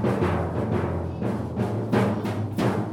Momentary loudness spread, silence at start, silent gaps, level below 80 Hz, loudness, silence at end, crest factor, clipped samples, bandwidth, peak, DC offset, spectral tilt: 5 LU; 0 s; none; -46 dBFS; -26 LUFS; 0 s; 16 dB; under 0.1%; 16.5 kHz; -10 dBFS; under 0.1%; -8 dB/octave